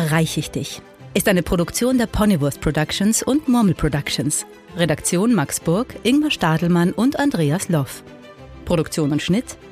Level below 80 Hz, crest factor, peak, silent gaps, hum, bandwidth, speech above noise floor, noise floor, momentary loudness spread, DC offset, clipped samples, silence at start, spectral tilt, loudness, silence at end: -40 dBFS; 16 dB; -2 dBFS; none; none; 15.5 kHz; 21 dB; -40 dBFS; 7 LU; under 0.1%; under 0.1%; 0 s; -5 dB/octave; -19 LUFS; 0 s